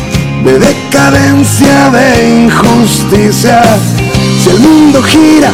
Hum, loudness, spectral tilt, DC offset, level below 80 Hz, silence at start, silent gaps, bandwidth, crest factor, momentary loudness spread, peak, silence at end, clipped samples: none; -5 LUFS; -5 dB/octave; 0.8%; -26 dBFS; 0 s; none; 16.5 kHz; 6 dB; 5 LU; 0 dBFS; 0 s; 10%